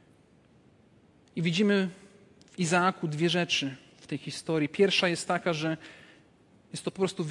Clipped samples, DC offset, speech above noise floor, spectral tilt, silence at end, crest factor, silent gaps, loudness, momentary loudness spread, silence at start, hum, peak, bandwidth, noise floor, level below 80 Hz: under 0.1%; under 0.1%; 33 dB; -4.5 dB/octave; 0 s; 20 dB; none; -28 LUFS; 15 LU; 1.35 s; none; -10 dBFS; 11.5 kHz; -61 dBFS; -72 dBFS